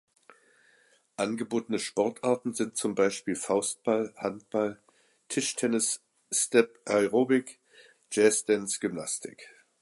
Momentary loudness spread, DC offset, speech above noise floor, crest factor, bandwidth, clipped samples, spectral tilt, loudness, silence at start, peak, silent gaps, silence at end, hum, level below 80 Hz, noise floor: 10 LU; under 0.1%; 37 dB; 22 dB; 12 kHz; under 0.1%; -3.5 dB/octave; -28 LUFS; 1.2 s; -8 dBFS; none; 0.35 s; none; -74 dBFS; -65 dBFS